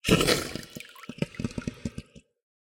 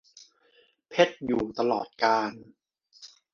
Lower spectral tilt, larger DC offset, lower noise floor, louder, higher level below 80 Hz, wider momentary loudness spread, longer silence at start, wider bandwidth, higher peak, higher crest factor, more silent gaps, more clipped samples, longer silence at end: about the same, -4 dB/octave vs -4.5 dB/octave; neither; second, -46 dBFS vs -64 dBFS; about the same, -29 LUFS vs -27 LUFS; first, -48 dBFS vs -64 dBFS; first, 20 LU vs 14 LU; second, 0.05 s vs 0.9 s; first, 17 kHz vs 7.2 kHz; about the same, -6 dBFS vs -4 dBFS; about the same, 24 dB vs 24 dB; neither; neither; first, 0.75 s vs 0.25 s